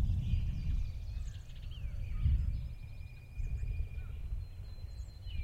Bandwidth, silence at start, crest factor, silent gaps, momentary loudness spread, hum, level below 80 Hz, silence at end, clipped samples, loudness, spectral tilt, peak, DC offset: 8.2 kHz; 0 s; 16 dB; none; 13 LU; none; -38 dBFS; 0 s; under 0.1%; -41 LUFS; -7 dB/octave; -20 dBFS; under 0.1%